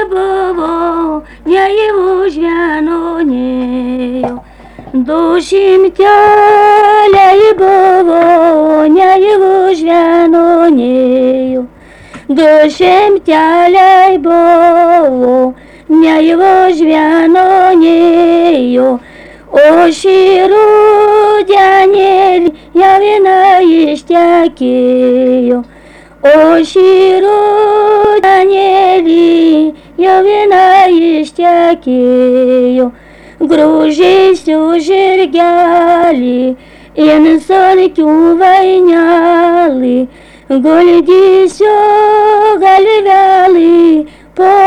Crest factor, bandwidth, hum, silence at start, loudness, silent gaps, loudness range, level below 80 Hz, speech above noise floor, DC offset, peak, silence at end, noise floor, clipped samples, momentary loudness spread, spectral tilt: 6 dB; 10.5 kHz; none; 0 s; -7 LUFS; none; 3 LU; -42 dBFS; 30 dB; under 0.1%; 0 dBFS; 0 s; -36 dBFS; under 0.1%; 8 LU; -5 dB/octave